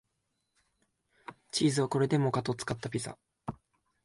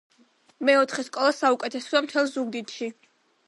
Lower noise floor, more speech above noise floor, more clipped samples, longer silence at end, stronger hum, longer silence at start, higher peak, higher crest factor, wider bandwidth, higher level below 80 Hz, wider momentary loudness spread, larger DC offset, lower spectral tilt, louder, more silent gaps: first, -81 dBFS vs -61 dBFS; first, 50 dB vs 37 dB; neither; about the same, 0.5 s vs 0.55 s; neither; first, 1.3 s vs 0.6 s; second, -16 dBFS vs -6 dBFS; about the same, 18 dB vs 20 dB; about the same, 11.5 kHz vs 11.5 kHz; first, -66 dBFS vs -84 dBFS; first, 19 LU vs 12 LU; neither; first, -5.5 dB/octave vs -2.5 dB/octave; second, -31 LUFS vs -24 LUFS; neither